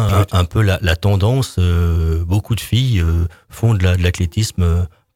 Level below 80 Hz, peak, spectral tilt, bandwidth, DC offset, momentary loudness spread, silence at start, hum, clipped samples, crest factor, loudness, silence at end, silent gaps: -26 dBFS; 0 dBFS; -6 dB/octave; 15.5 kHz; under 0.1%; 4 LU; 0 s; none; under 0.1%; 14 dB; -17 LUFS; 0.3 s; none